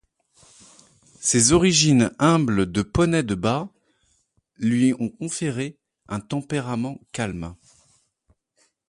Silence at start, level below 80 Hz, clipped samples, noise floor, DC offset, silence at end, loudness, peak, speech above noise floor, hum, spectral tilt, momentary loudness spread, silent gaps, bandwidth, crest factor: 1.2 s; -46 dBFS; under 0.1%; -67 dBFS; under 0.1%; 1.35 s; -21 LUFS; -4 dBFS; 46 dB; none; -4.5 dB/octave; 15 LU; none; 11.5 kHz; 20 dB